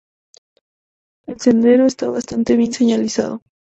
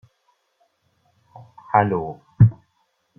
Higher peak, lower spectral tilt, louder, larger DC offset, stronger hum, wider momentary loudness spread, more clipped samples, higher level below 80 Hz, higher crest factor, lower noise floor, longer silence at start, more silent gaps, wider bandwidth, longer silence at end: about the same, -2 dBFS vs -2 dBFS; second, -5 dB/octave vs -11.5 dB/octave; first, -16 LUFS vs -19 LUFS; neither; neither; about the same, 10 LU vs 10 LU; neither; about the same, -54 dBFS vs -50 dBFS; second, 16 dB vs 22 dB; first, under -90 dBFS vs -68 dBFS; second, 1.3 s vs 1.75 s; neither; first, 8.2 kHz vs 3.1 kHz; second, 0.25 s vs 0.65 s